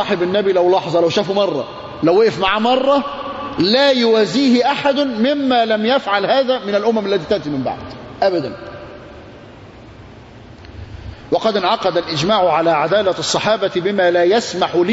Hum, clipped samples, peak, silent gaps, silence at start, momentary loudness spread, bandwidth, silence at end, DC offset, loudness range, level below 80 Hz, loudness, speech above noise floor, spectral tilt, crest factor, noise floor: none; under 0.1%; -2 dBFS; none; 0 s; 14 LU; 8 kHz; 0 s; under 0.1%; 10 LU; -48 dBFS; -16 LUFS; 23 dB; -4.5 dB/octave; 14 dB; -38 dBFS